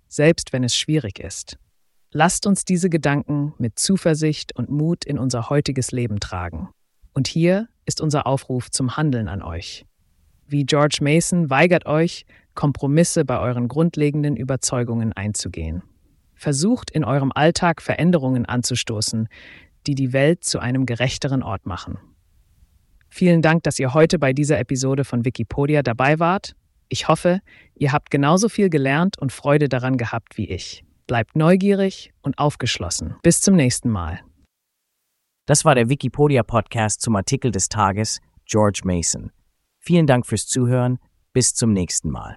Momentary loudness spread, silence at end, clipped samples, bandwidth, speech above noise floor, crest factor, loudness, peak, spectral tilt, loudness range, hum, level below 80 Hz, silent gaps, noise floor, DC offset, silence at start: 12 LU; 0 s; under 0.1%; 12 kHz; 57 dB; 20 dB; -20 LUFS; 0 dBFS; -5 dB/octave; 4 LU; none; -44 dBFS; none; -76 dBFS; under 0.1%; 0.1 s